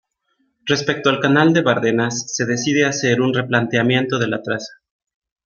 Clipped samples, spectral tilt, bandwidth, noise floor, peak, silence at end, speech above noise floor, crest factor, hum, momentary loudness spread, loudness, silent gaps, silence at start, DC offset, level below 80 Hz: under 0.1%; -4.5 dB/octave; 7.4 kHz; -67 dBFS; -2 dBFS; 0.7 s; 50 dB; 18 dB; none; 8 LU; -18 LUFS; none; 0.65 s; under 0.1%; -60 dBFS